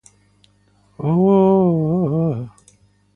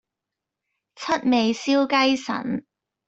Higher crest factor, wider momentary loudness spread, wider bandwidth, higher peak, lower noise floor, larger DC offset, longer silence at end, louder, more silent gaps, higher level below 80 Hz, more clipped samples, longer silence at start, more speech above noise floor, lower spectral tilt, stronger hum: about the same, 16 dB vs 18 dB; first, 14 LU vs 11 LU; first, 9.6 kHz vs 8 kHz; first, -2 dBFS vs -6 dBFS; second, -57 dBFS vs -85 dBFS; neither; first, 0.65 s vs 0.45 s; first, -17 LUFS vs -22 LUFS; neither; first, -54 dBFS vs -64 dBFS; neither; about the same, 1 s vs 1 s; second, 42 dB vs 64 dB; first, -10.5 dB/octave vs -4 dB/octave; first, 50 Hz at -40 dBFS vs none